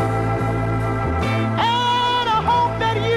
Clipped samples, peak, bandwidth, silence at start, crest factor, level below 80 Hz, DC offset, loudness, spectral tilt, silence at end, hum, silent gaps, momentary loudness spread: under 0.1%; -8 dBFS; 12 kHz; 0 s; 10 dB; -34 dBFS; under 0.1%; -19 LUFS; -6 dB/octave; 0 s; none; none; 4 LU